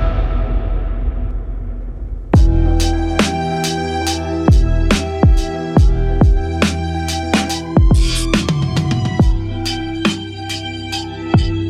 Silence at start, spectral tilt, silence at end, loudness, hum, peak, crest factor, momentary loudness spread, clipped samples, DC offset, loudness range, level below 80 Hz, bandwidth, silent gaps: 0 s; -5.5 dB/octave; 0 s; -17 LUFS; none; -2 dBFS; 14 dB; 10 LU; under 0.1%; under 0.1%; 3 LU; -18 dBFS; 13.5 kHz; none